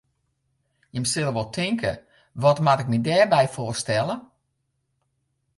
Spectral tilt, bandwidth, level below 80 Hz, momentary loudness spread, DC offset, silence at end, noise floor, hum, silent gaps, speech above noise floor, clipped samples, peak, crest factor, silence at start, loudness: -5 dB/octave; 11.5 kHz; -56 dBFS; 13 LU; under 0.1%; 1.35 s; -74 dBFS; none; none; 52 dB; under 0.1%; -6 dBFS; 18 dB; 0.95 s; -23 LUFS